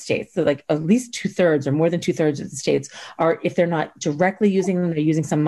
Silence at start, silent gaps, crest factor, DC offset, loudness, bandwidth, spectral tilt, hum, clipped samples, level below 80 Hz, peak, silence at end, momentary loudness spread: 0 s; none; 14 dB; under 0.1%; -21 LUFS; 12.5 kHz; -6 dB/octave; none; under 0.1%; -60 dBFS; -6 dBFS; 0 s; 5 LU